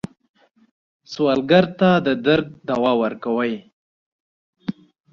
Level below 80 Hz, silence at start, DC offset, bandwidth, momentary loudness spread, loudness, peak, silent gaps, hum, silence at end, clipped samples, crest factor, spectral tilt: -58 dBFS; 1.1 s; under 0.1%; 7.2 kHz; 17 LU; -19 LUFS; -2 dBFS; 3.73-4.53 s; none; 0.4 s; under 0.1%; 20 dB; -7 dB/octave